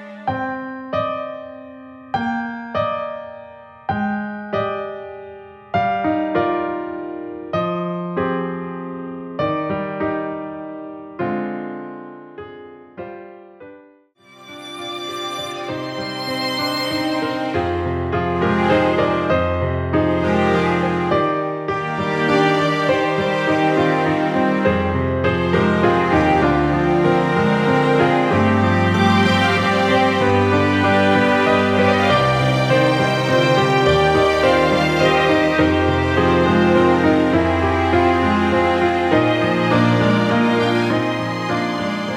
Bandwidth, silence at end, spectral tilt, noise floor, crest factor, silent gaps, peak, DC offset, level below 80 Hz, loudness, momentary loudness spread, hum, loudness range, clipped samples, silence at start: 15 kHz; 0 s; -6.5 dB/octave; -50 dBFS; 16 dB; none; -2 dBFS; under 0.1%; -42 dBFS; -18 LUFS; 14 LU; none; 11 LU; under 0.1%; 0 s